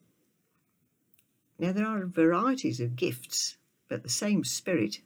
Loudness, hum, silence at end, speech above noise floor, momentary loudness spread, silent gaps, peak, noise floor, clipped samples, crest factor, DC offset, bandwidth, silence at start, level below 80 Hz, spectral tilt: -29 LUFS; none; 0.1 s; 45 dB; 8 LU; none; -14 dBFS; -74 dBFS; under 0.1%; 18 dB; under 0.1%; over 20 kHz; 1.6 s; -78 dBFS; -4.5 dB/octave